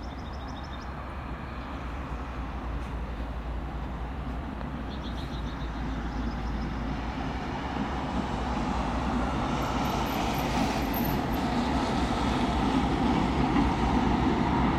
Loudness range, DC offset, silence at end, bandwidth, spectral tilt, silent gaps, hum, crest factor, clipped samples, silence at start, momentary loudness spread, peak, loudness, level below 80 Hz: 10 LU; under 0.1%; 0 s; 14 kHz; -6.5 dB/octave; none; none; 16 dB; under 0.1%; 0 s; 11 LU; -14 dBFS; -30 LUFS; -36 dBFS